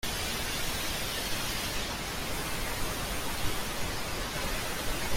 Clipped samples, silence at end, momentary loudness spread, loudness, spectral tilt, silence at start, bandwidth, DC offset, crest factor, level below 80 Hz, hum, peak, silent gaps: under 0.1%; 0 s; 2 LU; -33 LUFS; -2.5 dB/octave; 0.05 s; 16.5 kHz; under 0.1%; 16 dB; -40 dBFS; none; -16 dBFS; none